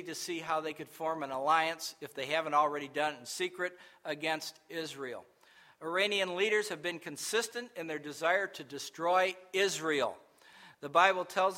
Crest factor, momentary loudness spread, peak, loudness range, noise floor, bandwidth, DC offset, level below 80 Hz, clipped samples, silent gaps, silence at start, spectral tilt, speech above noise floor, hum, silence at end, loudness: 24 dB; 12 LU; -10 dBFS; 4 LU; -61 dBFS; 16 kHz; under 0.1%; -82 dBFS; under 0.1%; none; 0 s; -2.5 dB/octave; 28 dB; none; 0 s; -33 LUFS